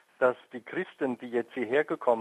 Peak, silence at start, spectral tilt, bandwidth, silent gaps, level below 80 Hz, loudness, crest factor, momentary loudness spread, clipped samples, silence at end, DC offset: -10 dBFS; 0.2 s; -6.5 dB/octave; 10.5 kHz; none; -86 dBFS; -30 LUFS; 20 dB; 8 LU; under 0.1%; 0 s; under 0.1%